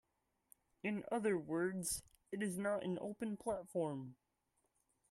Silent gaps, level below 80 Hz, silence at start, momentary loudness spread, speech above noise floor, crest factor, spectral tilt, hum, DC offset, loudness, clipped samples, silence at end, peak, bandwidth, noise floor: none; -72 dBFS; 0.85 s; 7 LU; 43 dB; 18 dB; -5 dB/octave; none; under 0.1%; -42 LUFS; under 0.1%; 1 s; -26 dBFS; 13.5 kHz; -84 dBFS